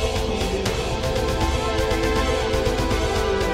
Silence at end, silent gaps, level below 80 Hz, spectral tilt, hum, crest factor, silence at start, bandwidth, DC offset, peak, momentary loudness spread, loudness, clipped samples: 0 s; none; -28 dBFS; -5 dB/octave; none; 14 dB; 0 s; 16 kHz; 0.1%; -8 dBFS; 2 LU; -22 LUFS; under 0.1%